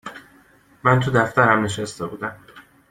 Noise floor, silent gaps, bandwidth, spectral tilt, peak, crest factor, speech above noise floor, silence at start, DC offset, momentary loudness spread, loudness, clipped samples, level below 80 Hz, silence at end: -54 dBFS; none; 15 kHz; -6 dB/octave; -2 dBFS; 20 dB; 34 dB; 0.05 s; under 0.1%; 15 LU; -20 LUFS; under 0.1%; -54 dBFS; 0.3 s